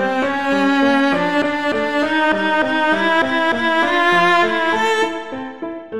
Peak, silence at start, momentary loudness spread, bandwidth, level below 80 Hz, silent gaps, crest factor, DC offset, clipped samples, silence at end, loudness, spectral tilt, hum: -4 dBFS; 0 s; 7 LU; 12.5 kHz; -54 dBFS; none; 12 dB; 1%; under 0.1%; 0 s; -16 LUFS; -4.5 dB/octave; none